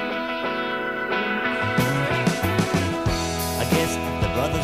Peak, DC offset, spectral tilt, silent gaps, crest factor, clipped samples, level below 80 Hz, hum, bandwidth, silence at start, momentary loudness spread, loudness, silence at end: -6 dBFS; under 0.1%; -5 dB/octave; none; 16 dB; under 0.1%; -38 dBFS; none; 15.5 kHz; 0 s; 4 LU; -23 LUFS; 0 s